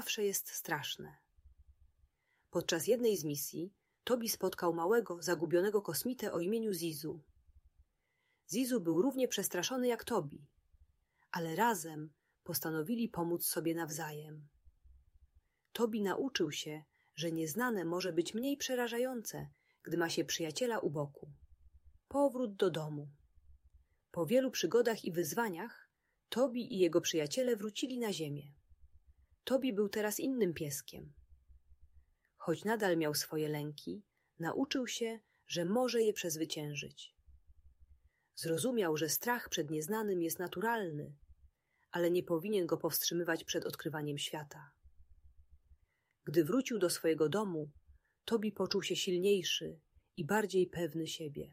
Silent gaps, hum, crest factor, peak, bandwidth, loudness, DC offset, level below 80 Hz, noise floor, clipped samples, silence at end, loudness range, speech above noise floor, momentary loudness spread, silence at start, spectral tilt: none; none; 20 dB; -18 dBFS; 16 kHz; -36 LUFS; under 0.1%; -72 dBFS; -81 dBFS; under 0.1%; 0 s; 4 LU; 45 dB; 14 LU; 0 s; -4 dB/octave